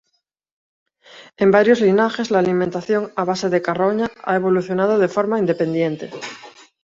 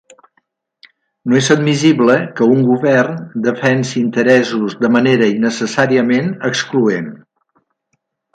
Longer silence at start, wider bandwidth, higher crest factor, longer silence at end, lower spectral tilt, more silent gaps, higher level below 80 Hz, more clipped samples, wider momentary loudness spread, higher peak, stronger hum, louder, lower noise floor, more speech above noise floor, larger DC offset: about the same, 1.15 s vs 1.25 s; second, 7.8 kHz vs 9.2 kHz; about the same, 18 dB vs 14 dB; second, 0.35 s vs 1.2 s; about the same, -6.5 dB/octave vs -5.5 dB/octave; neither; about the same, -60 dBFS vs -60 dBFS; neither; about the same, 9 LU vs 7 LU; about the same, -2 dBFS vs 0 dBFS; neither; second, -18 LUFS vs -14 LUFS; about the same, -72 dBFS vs -69 dBFS; about the same, 54 dB vs 55 dB; neither